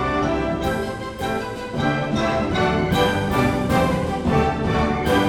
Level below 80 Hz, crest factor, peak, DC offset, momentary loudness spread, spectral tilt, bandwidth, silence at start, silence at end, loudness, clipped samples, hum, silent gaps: -34 dBFS; 16 dB; -6 dBFS; under 0.1%; 6 LU; -6 dB/octave; 20 kHz; 0 s; 0 s; -21 LUFS; under 0.1%; none; none